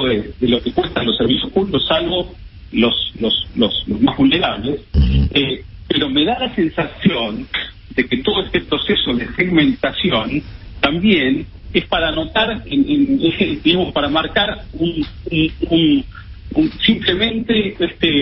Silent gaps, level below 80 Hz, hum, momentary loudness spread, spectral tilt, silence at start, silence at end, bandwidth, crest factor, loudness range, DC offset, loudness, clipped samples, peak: none; -30 dBFS; none; 7 LU; -10.5 dB/octave; 0 s; 0 s; 5.8 kHz; 16 dB; 1 LU; under 0.1%; -17 LUFS; under 0.1%; 0 dBFS